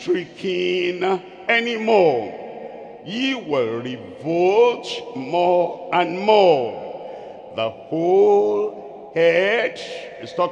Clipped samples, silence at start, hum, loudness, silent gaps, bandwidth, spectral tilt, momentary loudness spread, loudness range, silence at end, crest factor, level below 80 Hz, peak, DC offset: under 0.1%; 0 s; none; -20 LUFS; none; 9.2 kHz; -5.5 dB/octave; 17 LU; 3 LU; 0 s; 18 dB; -68 dBFS; -2 dBFS; under 0.1%